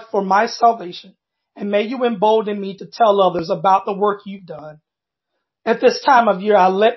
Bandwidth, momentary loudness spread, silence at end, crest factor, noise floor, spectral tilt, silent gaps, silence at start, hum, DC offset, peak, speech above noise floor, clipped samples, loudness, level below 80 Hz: 6.2 kHz; 17 LU; 0 s; 18 dB; -82 dBFS; -5.5 dB/octave; none; 0 s; none; under 0.1%; 0 dBFS; 66 dB; under 0.1%; -16 LUFS; -64 dBFS